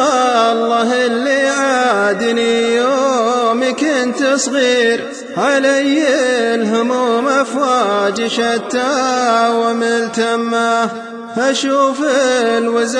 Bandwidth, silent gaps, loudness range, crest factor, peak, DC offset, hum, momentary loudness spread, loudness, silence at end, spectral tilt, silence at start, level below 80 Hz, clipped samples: 11 kHz; none; 1 LU; 12 dB; -2 dBFS; under 0.1%; none; 4 LU; -14 LUFS; 0 s; -3 dB/octave; 0 s; -60 dBFS; under 0.1%